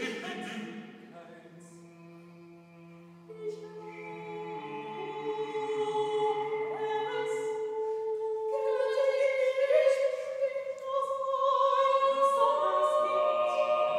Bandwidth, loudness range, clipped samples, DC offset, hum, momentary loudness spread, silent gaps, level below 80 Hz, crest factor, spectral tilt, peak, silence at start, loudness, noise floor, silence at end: 12 kHz; 18 LU; under 0.1%; under 0.1%; none; 17 LU; none; -86 dBFS; 16 dB; -4 dB/octave; -14 dBFS; 0 s; -30 LUFS; -52 dBFS; 0 s